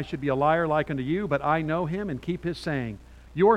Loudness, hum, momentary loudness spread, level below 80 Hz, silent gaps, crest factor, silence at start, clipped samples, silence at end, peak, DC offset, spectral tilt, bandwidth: -27 LUFS; none; 8 LU; -50 dBFS; none; 18 dB; 0 s; under 0.1%; 0 s; -8 dBFS; under 0.1%; -8 dB/octave; 11.5 kHz